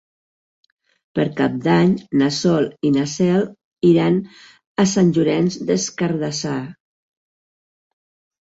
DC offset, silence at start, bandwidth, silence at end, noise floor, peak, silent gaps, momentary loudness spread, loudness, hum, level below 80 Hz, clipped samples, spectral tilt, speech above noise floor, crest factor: under 0.1%; 1.15 s; 8 kHz; 1.75 s; under -90 dBFS; -4 dBFS; 3.64-3.72 s, 4.67-4.75 s; 11 LU; -19 LUFS; none; -58 dBFS; under 0.1%; -6 dB/octave; over 72 dB; 16 dB